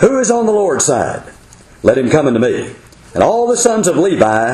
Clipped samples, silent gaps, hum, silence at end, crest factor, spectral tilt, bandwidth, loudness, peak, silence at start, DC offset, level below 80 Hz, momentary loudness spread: under 0.1%; none; none; 0 s; 12 dB; -4.5 dB/octave; 13 kHz; -13 LUFS; 0 dBFS; 0 s; under 0.1%; -44 dBFS; 10 LU